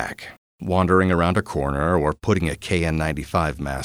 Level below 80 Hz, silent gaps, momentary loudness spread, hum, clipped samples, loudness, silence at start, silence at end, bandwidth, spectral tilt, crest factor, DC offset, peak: -36 dBFS; 0.37-0.59 s; 11 LU; none; under 0.1%; -21 LUFS; 0 s; 0 s; 15 kHz; -6.5 dB/octave; 18 dB; under 0.1%; -4 dBFS